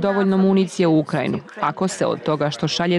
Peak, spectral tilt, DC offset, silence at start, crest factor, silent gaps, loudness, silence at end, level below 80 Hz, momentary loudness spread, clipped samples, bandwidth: -8 dBFS; -6 dB/octave; under 0.1%; 0 s; 12 dB; none; -20 LUFS; 0 s; -60 dBFS; 6 LU; under 0.1%; 11.5 kHz